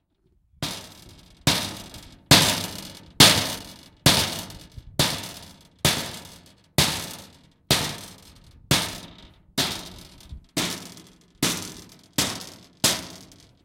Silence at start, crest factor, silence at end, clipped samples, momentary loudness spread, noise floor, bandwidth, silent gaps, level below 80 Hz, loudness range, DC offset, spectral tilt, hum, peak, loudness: 0.6 s; 26 dB; 0.4 s; under 0.1%; 25 LU; -65 dBFS; 17 kHz; none; -48 dBFS; 9 LU; under 0.1%; -2.5 dB/octave; none; 0 dBFS; -22 LUFS